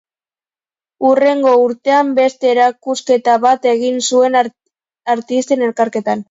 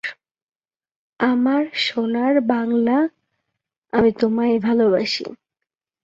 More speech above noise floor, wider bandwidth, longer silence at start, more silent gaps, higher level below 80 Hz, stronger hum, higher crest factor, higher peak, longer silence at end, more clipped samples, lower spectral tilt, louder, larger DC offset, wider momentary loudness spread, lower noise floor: first, over 77 dB vs 65 dB; about the same, 7.8 kHz vs 7.6 kHz; first, 1 s vs 0.05 s; second, none vs 0.31-0.35 s, 0.42-0.47 s, 0.56-0.60 s, 0.96-1.13 s, 3.78-3.82 s; second, -68 dBFS vs -58 dBFS; neither; about the same, 14 dB vs 18 dB; first, 0 dBFS vs -4 dBFS; second, 0.05 s vs 0.7 s; neither; second, -3.5 dB/octave vs -5.5 dB/octave; first, -14 LUFS vs -19 LUFS; neither; about the same, 8 LU vs 7 LU; first, under -90 dBFS vs -84 dBFS